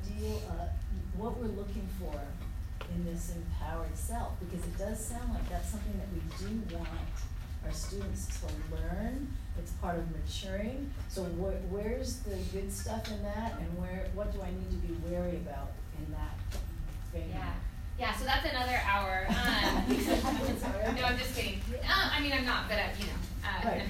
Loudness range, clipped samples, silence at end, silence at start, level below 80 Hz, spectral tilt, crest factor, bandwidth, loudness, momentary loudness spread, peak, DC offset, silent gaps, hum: 8 LU; under 0.1%; 0 s; 0 s; -38 dBFS; -5 dB/octave; 20 dB; 16 kHz; -35 LUFS; 11 LU; -14 dBFS; under 0.1%; none; none